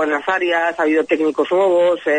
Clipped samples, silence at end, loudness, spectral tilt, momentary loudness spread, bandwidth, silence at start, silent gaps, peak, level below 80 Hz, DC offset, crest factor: under 0.1%; 0 s; -17 LUFS; -4.5 dB/octave; 3 LU; 9.2 kHz; 0 s; none; -4 dBFS; -64 dBFS; under 0.1%; 12 dB